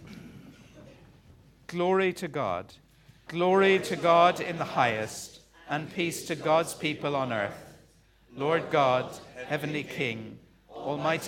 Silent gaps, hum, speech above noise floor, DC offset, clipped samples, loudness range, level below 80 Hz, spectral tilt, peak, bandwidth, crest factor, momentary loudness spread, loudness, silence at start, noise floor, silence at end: none; none; 33 dB; under 0.1%; under 0.1%; 5 LU; -64 dBFS; -5 dB/octave; -8 dBFS; 17 kHz; 20 dB; 18 LU; -28 LUFS; 0 s; -60 dBFS; 0 s